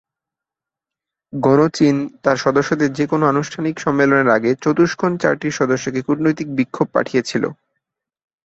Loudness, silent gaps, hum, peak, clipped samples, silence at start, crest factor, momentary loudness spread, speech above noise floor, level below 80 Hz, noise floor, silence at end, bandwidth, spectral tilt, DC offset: -17 LUFS; none; none; -2 dBFS; under 0.1%; 1.35 s; 16 dB; 7 LU; 70 dB; -56 dBFS; -87 dBFS; 0.95 s; 8 kHz; -6 dB/octave; under 0.1%